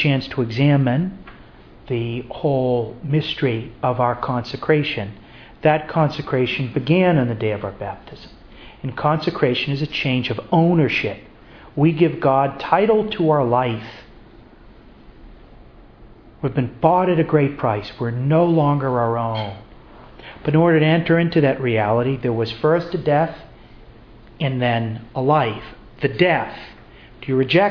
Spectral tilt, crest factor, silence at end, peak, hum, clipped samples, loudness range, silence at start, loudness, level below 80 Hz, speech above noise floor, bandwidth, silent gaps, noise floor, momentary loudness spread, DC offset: -8.5 dB/octave; 18 dB; 0 s; 0 dBFS; none; under 0.1%; 4 LU; 0 s; -19 LUFS; -48 dBFS; 26 dB; 5.4 kHz; none; -44 dBFS; 13 LU; under 0.1%